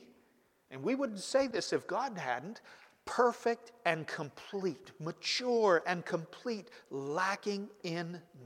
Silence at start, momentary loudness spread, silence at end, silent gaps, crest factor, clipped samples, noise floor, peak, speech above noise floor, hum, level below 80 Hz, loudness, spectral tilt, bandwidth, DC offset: 0 s; 13 LU; 0 s; none; 22 dB; under 0.1%; -70 dBFS; -14 dBFS; 35 dB; none; -80 dBFS; -35 LUFS; -4 dB/octave; 15.5 kHz; under 0.1%